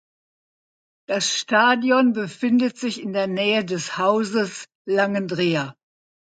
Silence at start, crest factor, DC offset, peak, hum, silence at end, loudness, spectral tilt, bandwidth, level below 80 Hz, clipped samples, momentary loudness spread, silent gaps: 1.1 s; 18 dB; under 0.1%; -4 dBFS; none; 0.65 s; -21 LUFS; -4 dB/octave; 9.2 kHz; -72 dBFS; under 0.1%; 10 LU; 4.75-4.85 s